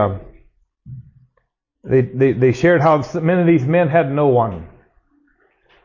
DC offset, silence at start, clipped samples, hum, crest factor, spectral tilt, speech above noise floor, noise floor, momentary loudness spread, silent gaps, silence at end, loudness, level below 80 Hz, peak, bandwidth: under 0.1%; 0 s; under 0.1%; none; 14 dB; -8.5 dB/octave; 52 dB; -67 dBFS; 7 LU; none; 1.2 s; -16 LUFS; -46 dBFS; -4 dBFS; 7.4 kHz